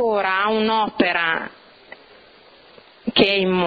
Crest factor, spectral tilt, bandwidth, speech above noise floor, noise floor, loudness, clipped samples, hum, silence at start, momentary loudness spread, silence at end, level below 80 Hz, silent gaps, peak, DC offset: 20 dB; -7 dB/octave; 5.4 kHz; 30 dB; -49 dBFS; -19 LUFS; under 0.1%; none; 0 s; 9 LU; 0 s; -54 dBFS; none; -2 dBFS; under 0.1%